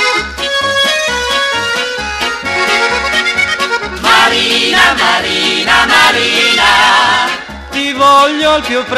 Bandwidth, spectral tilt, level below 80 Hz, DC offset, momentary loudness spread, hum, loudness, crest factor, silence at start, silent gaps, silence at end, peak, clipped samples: 16 kHz; -1.5 dB/octave; -36 dBFS; under 0.1%; 8 LU; none; -9 LUFS; 12 dB; 0 s; none; 0 s; 0 dBFS; under 0.1%